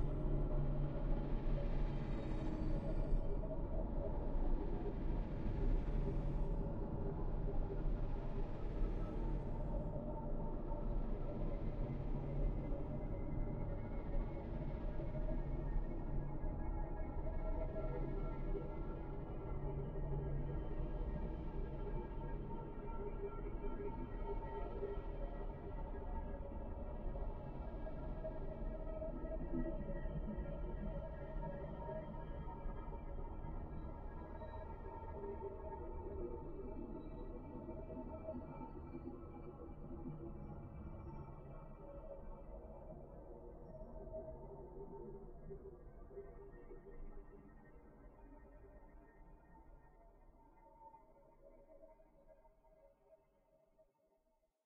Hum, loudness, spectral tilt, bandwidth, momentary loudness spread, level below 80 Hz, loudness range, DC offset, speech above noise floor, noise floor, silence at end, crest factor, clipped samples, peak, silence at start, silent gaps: none; -47 LUFS; -9 dB/octave; 4 kHz; 14 LU; -44 dBFS; 16 LU; under 0.1%; 32 dB; -81 dBFS; 0.85 s; 18 dB; under 0.1%; -24 dBFS; 0 s; none